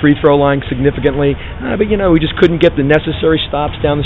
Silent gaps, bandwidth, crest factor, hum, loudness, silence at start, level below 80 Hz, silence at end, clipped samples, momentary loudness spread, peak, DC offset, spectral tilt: none; 7.6 kHz; 12 dB; none; -13 LUFS; 0 s; -28 dBFS; 0 s; 0.1%; 6 LU; 0 dBFS; under 0.1%; -8.5 dB/octave